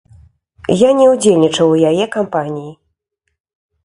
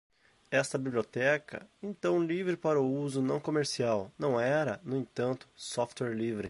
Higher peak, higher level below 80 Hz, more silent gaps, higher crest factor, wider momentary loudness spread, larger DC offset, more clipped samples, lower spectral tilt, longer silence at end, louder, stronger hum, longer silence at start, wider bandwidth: first, 0 dBFS vs -14 dBFS; first, -52 dBFS vs -68 dBFS; neither; about the same, 14 dB vs 18 dB; first, 16 LU vs 7 LU; neither; neither; about the same, -5.5 dB/octave vs -5.5 dB/octave; first, 1.1 s vs 0 s; first, -13 LUFS vs -32 LUFS; neither; first, 0.7 s vs 0.5 s; about the same, 11.5 kHz vs 11.5 kHz